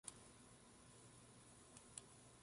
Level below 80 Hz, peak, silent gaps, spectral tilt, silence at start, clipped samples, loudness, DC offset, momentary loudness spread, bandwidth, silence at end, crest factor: -78 dBFS; -36 dBFS; none; -2.5 dB/octave; 0.05 s; under 0.1%; -62 LUFS; under 0.1%; 7 LU; 11.5 kHz; 0 s; 28 dB